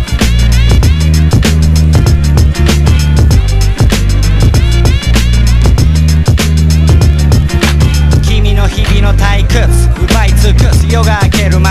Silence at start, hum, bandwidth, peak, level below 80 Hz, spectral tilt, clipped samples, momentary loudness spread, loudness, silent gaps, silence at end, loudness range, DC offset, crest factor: 0 s; none; 15 kHz; 0 dBFS; -10 dBFS; -5.5 dB/octave; 1%; 2 LU; -9 LUFS; none; 0 s; 1 LU; under 0.1%; 6 dB